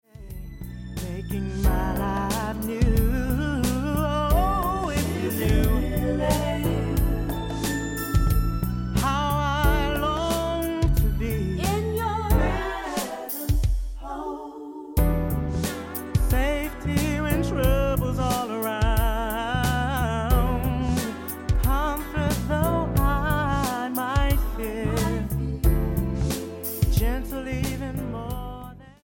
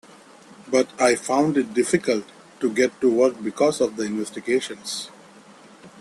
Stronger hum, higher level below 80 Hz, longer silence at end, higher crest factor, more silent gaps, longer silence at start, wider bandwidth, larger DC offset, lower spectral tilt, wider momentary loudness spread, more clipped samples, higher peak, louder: neither; first, -28 dBFS vs -66 dBFS; first, 0.15 s vs 0 s; about the same, 16 dB vs 18 dB; neither; second, 0.15 s vs 0.5 s; first, 17 kHz vs 12.5 kHz; neither; first, -6 dB/octave vs -4 dB/octave; about the same, 8 LU vs 10 LU; neither; second, -8 dBFS vs -4 dBFS; second, -25 LUFS vs -22 LUFS